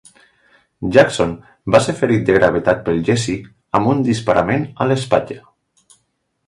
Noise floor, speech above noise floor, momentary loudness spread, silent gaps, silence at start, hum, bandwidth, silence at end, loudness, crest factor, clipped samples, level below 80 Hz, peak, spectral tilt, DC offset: -68 dBFS; 53 dB; 11 LU; none; 0.8 s; none; 11.5 kHz; 1.1 s; -16 LUFS; 18 dB; under 0.1%; -44 dBFS; 0 dBFS; -6 dB/octave; under 0.1%